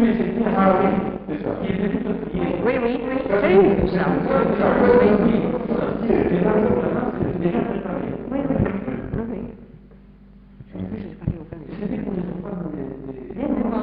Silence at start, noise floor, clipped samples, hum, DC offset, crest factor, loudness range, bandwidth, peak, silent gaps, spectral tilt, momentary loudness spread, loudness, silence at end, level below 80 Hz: 0 s; -46 dBFS; under 0.1%; none; under 0.1%; 16 dB; 13 LU; 5 kHz; -4 dBFS; none; -7 dB/octave; 15 LU; -21 LUFS; 0 s; -40 dBFS